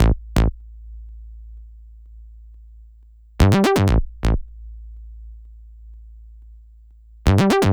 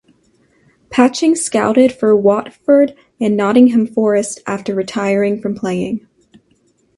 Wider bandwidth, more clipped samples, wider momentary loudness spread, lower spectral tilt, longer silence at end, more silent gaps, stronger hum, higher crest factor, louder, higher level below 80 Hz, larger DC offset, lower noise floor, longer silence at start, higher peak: first, over 20 kHz vs 11.5 kHz; neither; first, 26 LU vs 9 LU; about the same, -6.5 dB/octave vs -5.5 dB/octave; second, 0 s vs 1 s; neither; neither; first, 22 dB vs 14 dB; second, -19 LUFS vs -14 LUFS; first, -26 dBFS vs -56 dBFS; neither; second, -47 dBFS vs -57 dBFS; second, 0 s vs 0.9 s; about the same, 0 dBFS vs 0 dBFS